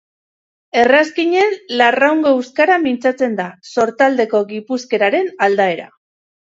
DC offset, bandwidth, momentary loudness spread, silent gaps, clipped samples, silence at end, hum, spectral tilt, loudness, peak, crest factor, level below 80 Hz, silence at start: under 0.1%; 7.8 kHz; 8 LU; none; under 0.1%; 0.7 s; none; -4.5 dB/octave; -15 LUFS; 0 dBFS; 16 dB; -64 dBFS; 0.75 s